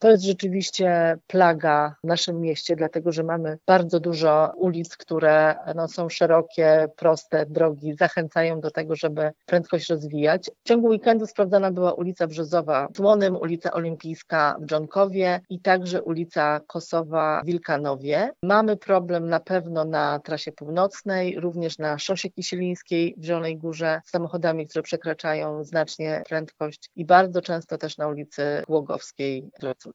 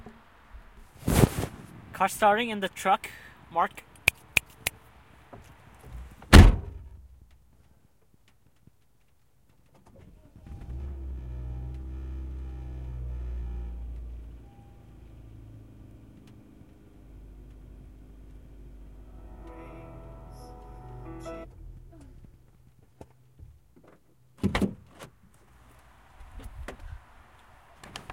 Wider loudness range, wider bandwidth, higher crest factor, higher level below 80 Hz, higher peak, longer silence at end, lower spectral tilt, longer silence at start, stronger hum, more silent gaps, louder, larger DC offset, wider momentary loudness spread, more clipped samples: second, 5 LU vs 26 LU; second, 8 kHz vs 16.5 kHz; second, 22 dB vs 30 dB; second, -74 dBFS vs -34 dBFS; about the same, -2 dBFS vs 0 dBFS; about the same, 0.05 s vs 0 s; about the same, -5.5 dB/octave vs -5.5 dB/octave; about the same, 0 s vs 0.05 s; neither; neither; first, -23 LUFS vs -27 LUFS; neither; second, 10 LU vs 27 LU; neither